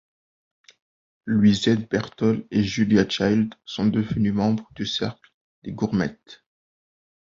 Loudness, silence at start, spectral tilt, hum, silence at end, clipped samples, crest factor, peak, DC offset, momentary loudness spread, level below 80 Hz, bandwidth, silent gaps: -23 LUFS; 1.25 s; -6 dB/octave; none; 0.9 s; under 0.1%; 20 dB; -4 dBFS; under 0.1%; 10 LU; -52 dBFS; 7.6 kHz; 5.34-5.62 s